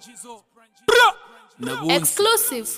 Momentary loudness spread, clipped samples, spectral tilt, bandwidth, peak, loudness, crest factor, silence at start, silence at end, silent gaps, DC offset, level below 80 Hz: 19 LU; under 0.1%; -1.5 dB/octave; 16 kHz; -4 dBFS; -18 LUFS; 18 dB; 0.15 s; 0 s; none; under 0.1%; -60 dBFS